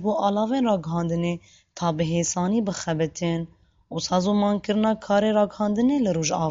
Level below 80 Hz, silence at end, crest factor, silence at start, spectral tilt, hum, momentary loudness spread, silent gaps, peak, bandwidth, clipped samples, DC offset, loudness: -54 dBFS; 0 s; 16 dB; 0 s; -5.5 dB/octave; none; 7 LU; none; -8 dBFS; 7.8 kHz; under 0.1%; under 0.1%; -24 LUFS